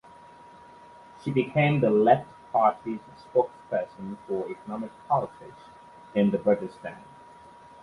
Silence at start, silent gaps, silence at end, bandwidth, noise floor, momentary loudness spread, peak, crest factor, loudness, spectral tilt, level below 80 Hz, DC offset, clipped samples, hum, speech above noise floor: 1.25 s; none; 0.8 s; 11 kHz; -50 dBFS; 17 LU; -6 dBFS; 22 dB; -26 LUFS; -8.5 dB/octave; -64 dBFS; under 0.1%; under 0.1%; none; 24 dB